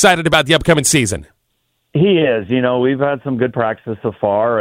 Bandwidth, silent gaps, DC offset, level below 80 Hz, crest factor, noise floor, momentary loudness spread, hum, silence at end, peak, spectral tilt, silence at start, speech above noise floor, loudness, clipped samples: 16.5 kHz; none; under 0.1%; -42 dBFS; 16 dB; -67 dBFS; 9 LU; none; 0 s; 0 dBFS; -4 dB/octave; 0 s; 52 dB; -15 LUFS; under 0.1%